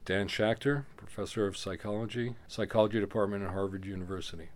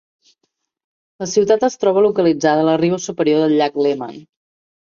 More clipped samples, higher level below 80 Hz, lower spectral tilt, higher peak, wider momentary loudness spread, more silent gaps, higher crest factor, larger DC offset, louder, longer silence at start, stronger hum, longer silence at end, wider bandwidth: neither; about the same, -58 dBFS vs -62 dBFS; about the same, -6 dB/octave vs -5.5 dB/octave; second, -12 dBFS vs -2 dBFS; first, 11 LU vs 5 LU; neither; first, 22 dB vs 16 dB; neither; second, -33 LUFS vs -16 LUFS; second, 0 s vs 1.2 s; neither; second, 0 s vs 0.65 s; first, 16 kHz vs 7.4 kHz